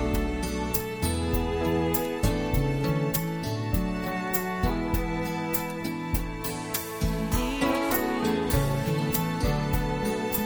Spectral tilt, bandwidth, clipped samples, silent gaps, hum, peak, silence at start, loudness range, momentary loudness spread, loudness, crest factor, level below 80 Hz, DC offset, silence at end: -5.5 dB/octave; over 20 kHz; under 0.1%; none; none; -8 dBFS; 0 s; 3 LU; 5 LU; -28 LUFS; 18 dB; -34 dBFS; under 0.1%; 0 s